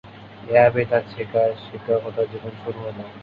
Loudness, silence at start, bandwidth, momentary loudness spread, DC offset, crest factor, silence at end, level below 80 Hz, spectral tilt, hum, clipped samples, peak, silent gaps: -22 LUFS; 0.05 s; 5.2 kHz; 16 LU; under 0.1%; 20 dB; 0 s; -56 dBFS; -9 dB/octave; none; under 0.1%; -2 dBFS; none